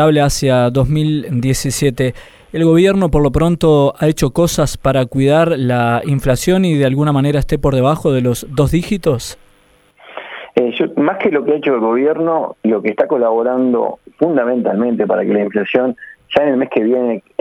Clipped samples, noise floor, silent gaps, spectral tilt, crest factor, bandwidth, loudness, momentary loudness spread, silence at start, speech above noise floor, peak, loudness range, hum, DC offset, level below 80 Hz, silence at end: under 0.1%; -51 dBFS; none; -6.5 dB/octave; 14 dB; 16.5 kHz; -14 LUFS; 6 LU; 0 s; 38 dB; 0 dBFS; 4 LU; none; under 0.1%; -32 dBFS; 0.2 s